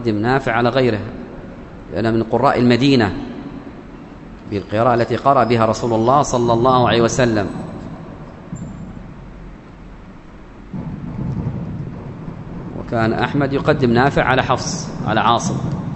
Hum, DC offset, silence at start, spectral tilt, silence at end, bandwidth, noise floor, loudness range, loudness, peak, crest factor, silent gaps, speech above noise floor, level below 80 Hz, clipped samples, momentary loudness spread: none; under 0.1%; 0 s; -6 dB/octave; 0 s; 8.4 kHz; -38 dBFS; 14 LU; -17 LUFS; 0 dBFS; 18 dB; none; 22 dB; -40 dBFS; under 0.1%; 21 LU